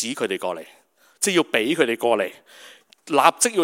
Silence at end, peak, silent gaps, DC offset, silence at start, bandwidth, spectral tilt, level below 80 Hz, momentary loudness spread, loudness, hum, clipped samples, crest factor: 0 s; 0 dBFS; none; under 0.1%; 0 s; 16.5 kHz; -2.5 dB/octave; -74 dBFS; 11 LU; -21 LUFS; none; under 0.1%; 22 dB